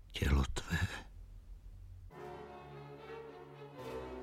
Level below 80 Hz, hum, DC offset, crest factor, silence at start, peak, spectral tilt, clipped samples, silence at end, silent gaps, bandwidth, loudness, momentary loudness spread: -44 dBFS; none; under 0.1%; 22 dB; 0 s; -20 dBFS; -5.5 dB/octave; under 0.1%; 0 s; none; 15 kHz; -41 LUFS; 22 LU